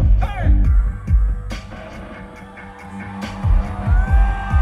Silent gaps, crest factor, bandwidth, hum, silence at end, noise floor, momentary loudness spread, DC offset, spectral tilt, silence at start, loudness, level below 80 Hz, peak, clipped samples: none; 12 dB; 6.2 kHz; none; 0 s; -36 dBFS; 18 LU; under 0.1%; -7.5 dB/octave; 0 s; -20 LUFS; -18 dBFS; -4 dBFS; under 0.1%